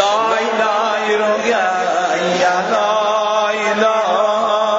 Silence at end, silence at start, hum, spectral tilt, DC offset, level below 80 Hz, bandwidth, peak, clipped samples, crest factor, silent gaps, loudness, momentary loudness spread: 0 s; 0 s; none; -3 dB/octave; under 0.1%; -62 dBFS; 8 kHz; -2 dBFS; under 0.1%; 14 dB; none; -15 LUFS; 2 LU